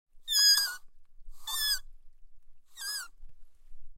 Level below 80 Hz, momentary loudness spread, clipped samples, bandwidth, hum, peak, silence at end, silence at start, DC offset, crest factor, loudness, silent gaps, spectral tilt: -52 dBFS; 23 LU; under 0.1%; 16 kHz; none; -14 dBFS; 0 s; 0.15 s; under 0.1%; 20 dB; -27 LUFS; none; 4 dB/octave